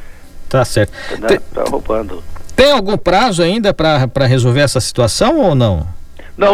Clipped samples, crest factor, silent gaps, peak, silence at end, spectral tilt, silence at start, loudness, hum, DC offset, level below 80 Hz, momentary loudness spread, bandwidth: under 0.1%; 14 dB; none; 0 dBFS; 0 s; -5.5 dB/octave; 0 s; -13 LUFS; none; under 0.1%; -30 dBFS; 9 LU; 15.5 kHz